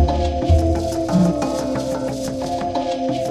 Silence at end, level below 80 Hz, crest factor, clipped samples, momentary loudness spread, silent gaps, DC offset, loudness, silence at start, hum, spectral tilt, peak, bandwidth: 0 s; -26 dBFS; 14 dB; under 0.1%; 6 LU; none; under 0.1%; -20 LUFS; 0 s; none; -7 dB/octave; -4 dBFS; 13.5 kHz